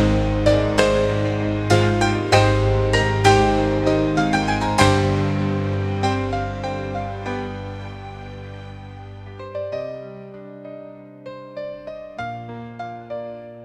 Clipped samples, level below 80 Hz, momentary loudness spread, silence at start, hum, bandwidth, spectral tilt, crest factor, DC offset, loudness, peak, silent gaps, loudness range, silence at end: under 0.1%; -34 dBFS; 20 LU; 0 s; none; 12 kHz; -6 dB/octave; 20 dB; under 0.1%; -20 LUFS; 0 dBFS; none; 16 LU; 0 s